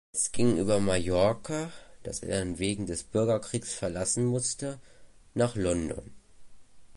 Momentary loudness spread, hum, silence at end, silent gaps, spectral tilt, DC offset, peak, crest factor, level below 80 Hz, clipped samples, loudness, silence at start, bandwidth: 12 LU; none; 0.05 s; none; -5 dB/octave; under 0.1%; -12 dBFS; 16 dB; -50 dBFS; under 0.1%; -29 LUFS; 0.15 s; 11.5 kHz